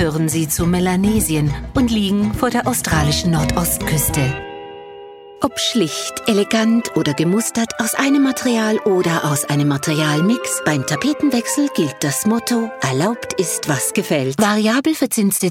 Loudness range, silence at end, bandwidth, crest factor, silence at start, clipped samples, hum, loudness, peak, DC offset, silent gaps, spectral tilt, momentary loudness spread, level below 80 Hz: 2 LU; 0 s; 17 kHz; 16 dB; 0 s; under 0.1%; none; -17 LUFS; 0 dBFS; under 0.1%; none; -4.5 dB/octave; 4 LU; -36 dBFS